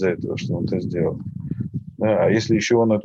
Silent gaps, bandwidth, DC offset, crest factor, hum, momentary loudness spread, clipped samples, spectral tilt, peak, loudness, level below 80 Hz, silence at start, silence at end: none; 7.8 kHz; under 0.1%; 14 dB; none; 12 LU; under 0.1%; -6.5 dB/octave; -6 dBFS; -22 LUFS; -50 dBFS; 0 s; 0 s